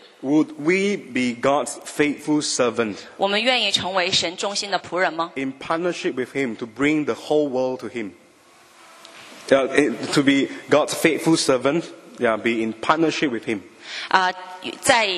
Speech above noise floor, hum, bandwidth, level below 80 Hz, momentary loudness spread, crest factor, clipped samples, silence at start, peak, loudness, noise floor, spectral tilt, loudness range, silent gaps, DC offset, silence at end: 31 dB; none; 13.5 kHz; -62 dBFS; 11 LU; 22 dB; under 0.1%; 0.2 s; 0 dBFS; -21 LUFS; -52 dBFS; -3.5 dB/octave; 4 LU; none; under 0.1%; 0 s